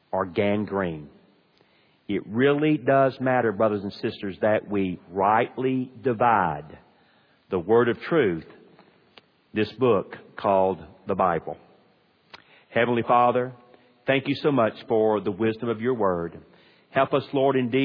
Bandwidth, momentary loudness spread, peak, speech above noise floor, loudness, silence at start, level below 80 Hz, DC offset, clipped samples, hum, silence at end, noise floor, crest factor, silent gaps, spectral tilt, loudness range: 5.2 kHz; 10 LU; -6 dBFS; 39 dB; -24 LUFS; 0.15 s; -62 dBFS; under 0.1%; under 0.1%; none; 0 s; -62 dBFS; 18 dB; none; -9.5 dB/octave; 3 LU